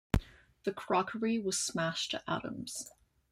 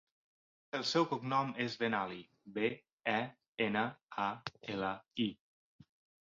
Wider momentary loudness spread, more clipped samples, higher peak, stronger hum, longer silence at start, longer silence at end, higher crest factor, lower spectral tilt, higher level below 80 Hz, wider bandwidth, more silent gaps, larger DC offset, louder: about the same, 9 LU vs 10 LU; neither; first, -12 dBFS vs -18 dBFS; neither; second, 0.15 s vs 0.75 s; second, 0.45 s vs 0.95 s; about the same, 24 dB vs 20 dB; about the same, -4 dB/octave vs -3 dB/octave; first, -46 dBFS vs -76 dBFS; first, 16 kHz vs 7.4 kHz; second, none vs 2.92-2.98 s, 3.48-3.53 s, 4.03-4.09 s; neither; about the same, -35 LUFS vs -37 LUFS